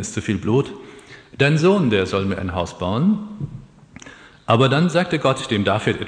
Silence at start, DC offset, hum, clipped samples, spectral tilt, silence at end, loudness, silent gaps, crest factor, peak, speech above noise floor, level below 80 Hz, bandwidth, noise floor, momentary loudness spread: 0 s; under 0.1%; none; under 0.1%; -6 dB/octave; 0 s; -19 LUFS; none; 18 dB; -2 dBFS; 24 dB; -50 dBFS; 10 kHz; -43 dBFS; 17 LU